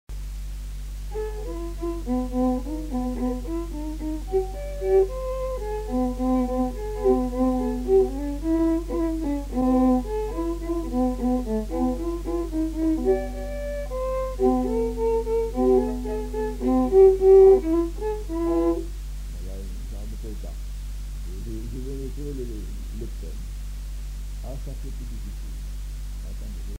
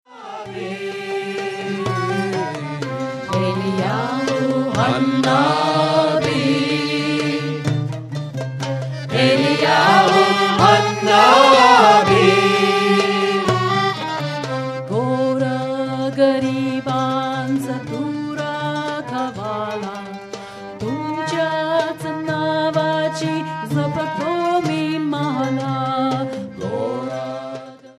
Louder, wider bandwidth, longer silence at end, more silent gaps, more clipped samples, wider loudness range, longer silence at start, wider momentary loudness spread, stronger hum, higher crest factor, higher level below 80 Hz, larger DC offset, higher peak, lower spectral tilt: second, -24 LUFS vs -18 LUFS; first, 16 kHz vs 13.5 kHz; about the same, 0 s vs 0.1 s; neither; neither; first, 16 LU vs 11 LU; about the same, 0.1 s vs 0.1 s; about the same, 15 LU vs 14 LU; neither; about the same, 18 dB vs 18 dB; first, -32 dBFS vs -56 dBFS; neither; second, -6 dBFS vs 0 dBFS; first, -7.5 dB/octave vs -5.5 dB/octave